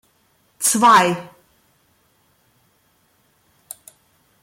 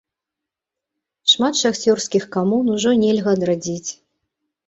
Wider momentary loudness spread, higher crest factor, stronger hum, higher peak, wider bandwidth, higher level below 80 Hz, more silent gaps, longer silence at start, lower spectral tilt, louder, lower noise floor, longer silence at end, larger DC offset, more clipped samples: first, 26 LU vs 8 LU; about the same, 20 dB vs 18 dB; neither; about the same, -2 dBFS vs -2 dBFS; first, 16.5 kHz vs 8 kHz; second, -68 dBFS vs -60 dBFS; neither; second, 0.6 s vs 1.25 s; second, -2.5 dB/octave vs -4 dB/octave; first, -15 LUFS vs -18 LUFS; second, -62 dBFS vs -85 dBFS; first, 3.2 s vs 0.75 s; neither; neither